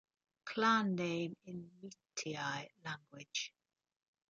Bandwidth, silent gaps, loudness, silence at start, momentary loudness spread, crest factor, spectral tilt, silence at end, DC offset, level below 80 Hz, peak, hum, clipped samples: 9 kHz; none; -39 LUFS; 0.45 s; 18 LU; 22 dB; -4 dB/octave; 0.8 s; under 0.1%; -84 dBFS; -18 dBFS; none; under 0.1%